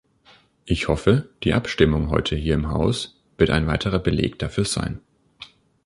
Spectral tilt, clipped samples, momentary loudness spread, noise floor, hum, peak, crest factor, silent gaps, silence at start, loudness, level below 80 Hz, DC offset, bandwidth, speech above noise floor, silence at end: -6 dB/octave; under 0.1%; 16 LU; -55 dBFS; none; -2 dBFS; 20 dB; none; 0.65 s; -22 LUFS; -34 dBFS; under 0.1%; 11.5 kHz; 34 dB; 0.4 s